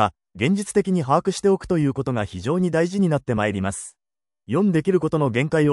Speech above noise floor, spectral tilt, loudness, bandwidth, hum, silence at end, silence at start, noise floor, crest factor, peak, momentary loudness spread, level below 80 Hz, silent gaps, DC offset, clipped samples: over 69 dB; -6.5 dB/octave; -22 LUFS; 12 kHz; none; 0 s; 0 s; under -90 dBFS; 18 dB; -4 dBFS; 6 LU; -52 dBFS; none; under 0.1%; under 0.1%